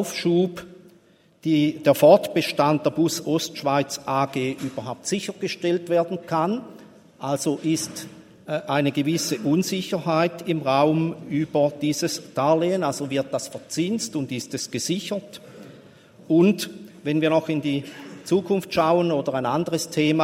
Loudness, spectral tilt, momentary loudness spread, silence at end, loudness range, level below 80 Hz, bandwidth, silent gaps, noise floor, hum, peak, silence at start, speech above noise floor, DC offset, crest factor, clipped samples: -23 LUFS; -5 dB/octave; 11 LU; 0 s; 5 LU; -66 dBFS; 16.5 kHz; none; -56 dBFS; none; -2 dBFS; 0 s; 34 dB; under 0.1%; 22 dB; under 0.1%